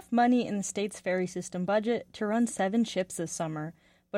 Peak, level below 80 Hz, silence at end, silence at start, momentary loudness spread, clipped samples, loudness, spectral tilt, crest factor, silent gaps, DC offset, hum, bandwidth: -14 dBFS; -68 dBFS; 0 s; 0 s; 9 LU; under 0.1%; -30 LUFS; -5 dB/octave; 14 dB; none; under 0.1%; none; 14.5 kHz